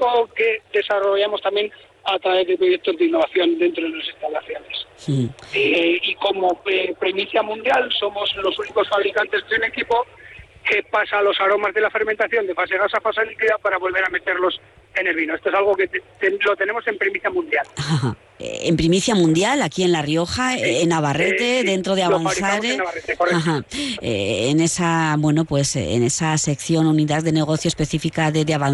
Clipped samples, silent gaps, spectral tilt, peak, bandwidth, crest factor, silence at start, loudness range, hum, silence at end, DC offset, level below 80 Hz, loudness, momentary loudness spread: under 0.1%; none; -4.5 dB/octave; -6 dBFS; 12 kHz; 14 dB; 0 s; 2 LU; none; 0 s; under 0.1%; -50 dBFS; -20 LUFS; 6 LU